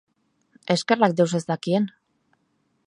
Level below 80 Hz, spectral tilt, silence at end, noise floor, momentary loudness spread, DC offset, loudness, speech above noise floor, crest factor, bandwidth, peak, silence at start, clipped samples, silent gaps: -74 dBFS; -5.5 dB/octave; 1 s; -70 dBFS; 9 LU; under 0.1%; -23 LUFS; 48 dB; 22 dB; 11 kHz; -2 dBFS; 0.7 s; under 0.1%; none